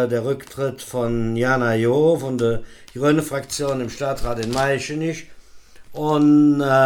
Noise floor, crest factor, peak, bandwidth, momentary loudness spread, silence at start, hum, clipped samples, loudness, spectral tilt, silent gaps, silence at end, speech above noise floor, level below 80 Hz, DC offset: -42 dBFS; 14 dB; -6 dBFS; 17.5 kHz; 12 LU; 0 s; none; under 0.1%; -20 LUFS; -6 dB/octave; none; 0 s; 22 dB; -42 dBFS; under 0.1%